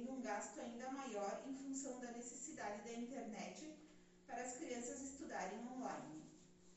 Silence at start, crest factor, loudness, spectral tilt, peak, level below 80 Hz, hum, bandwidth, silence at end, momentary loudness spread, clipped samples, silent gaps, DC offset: 0 s; 16 dB; -49 LUFS; -3.5 dB/octave; -34 dBFS; -80 dBFS; none; 8.2 kHz; 0 s; 11 LU; under 0.1%; none; under 0.1%